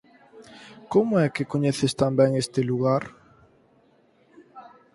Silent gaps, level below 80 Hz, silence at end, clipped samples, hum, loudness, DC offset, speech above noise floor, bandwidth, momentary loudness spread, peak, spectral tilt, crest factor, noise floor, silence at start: none; -62 dBFS; 0.35 s; under 0.1%; none; -23 LUFS; under 0.1%; 38 dB; 11.5 kHz; 22 LU; -6 dBFS; -6.5 dB/octave; 20 dB; -61 dBFS; 0.35 s